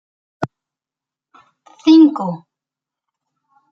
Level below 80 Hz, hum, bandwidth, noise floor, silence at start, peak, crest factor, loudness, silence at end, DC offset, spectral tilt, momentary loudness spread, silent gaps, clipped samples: -66 dBFS; none; 6.6 kHz; -88 dBFS; 0.4 s; -2 dBFS; 18 dB; -13 LUFS; 1.35 s; under 0.1%; -7 dB/octave; 18 LU; none; under 0.1%